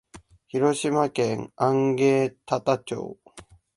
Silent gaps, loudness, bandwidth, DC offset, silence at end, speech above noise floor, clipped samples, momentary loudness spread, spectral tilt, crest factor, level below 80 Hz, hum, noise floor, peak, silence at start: none; -24 LUFS; 11.5 kHz; under 0.1%; 0.35 s; 27 dB; under 0.1%; 11 LU; -6 dB/octave; 18 dB; -62 dBFS; none; -50 dBFS; -6 dBFS; 0.15 s